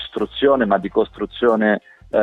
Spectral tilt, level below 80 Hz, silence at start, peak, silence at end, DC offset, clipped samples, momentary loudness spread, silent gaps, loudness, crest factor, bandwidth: -7.5 dB/octave; -48 dBFS; 0 s; -2 dBFS; 0 s; under 0.1%; under 0.1%; 8 LU; none; -19 LUFS; 16 dB; 4.4 kHz